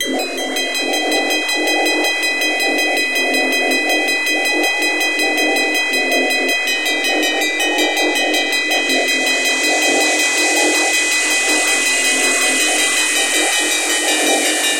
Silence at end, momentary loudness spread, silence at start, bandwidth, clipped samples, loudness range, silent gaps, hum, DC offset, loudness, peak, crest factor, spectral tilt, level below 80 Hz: 0 s; 3 LU; 0 s; 17 kHz; under 0.1%; 2 LU; none; none; under 0.1%; -14 LUFS; -2 dBFS; 14 dB; 1.5 dB/octave; -64 dBFS